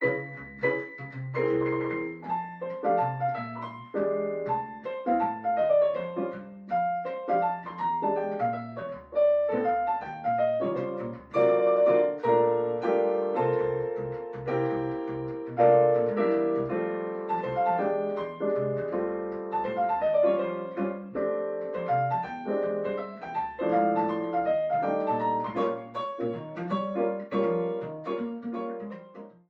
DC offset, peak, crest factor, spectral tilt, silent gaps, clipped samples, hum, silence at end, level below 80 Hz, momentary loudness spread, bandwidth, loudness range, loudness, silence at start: under 0.1%; -10 dBFS; 18 dB; -9 dB/octave; none; under 0.1%; none; 0.2 s; -66 dBFS; 11 LU; 5.8 kHz; 5 LU; -28 LUFS; 0 s